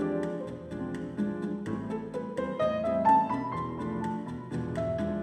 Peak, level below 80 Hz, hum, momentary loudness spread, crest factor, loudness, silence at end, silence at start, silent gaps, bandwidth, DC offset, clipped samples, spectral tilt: -12 dBFS; -56 dBFS; none; 12 LU; 18 dB; -31 LUFS; 0 s; 0 s; none; 10 kHz; under 0.1%; under 0.1%; -8 dB/octave